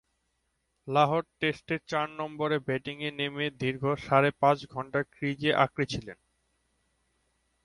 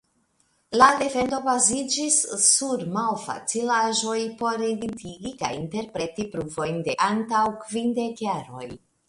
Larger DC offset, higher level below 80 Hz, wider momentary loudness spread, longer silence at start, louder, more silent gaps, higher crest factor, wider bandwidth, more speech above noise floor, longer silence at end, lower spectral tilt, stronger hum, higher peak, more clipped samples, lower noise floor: neither; about the same, -62 dBFS vs -60 dBFS; second, 9 LU vs 13 LU; first, 0.85 s vs 0.7 s; second, -29 LUFS vs -23 LUFS; neither; about the same, 22 dB vs 24 dB; about the same, 11.5 kHz vs 11.5 kHz; first, 48 dB vs 43 dB; first, 1.5 s vs 0.3 s; first, -6 dB/octave vs -2.5 dB/octave; neither; second, -8 dBFS vs -2 dBFS; neither; first, -77 dBFS vs -67 dBFS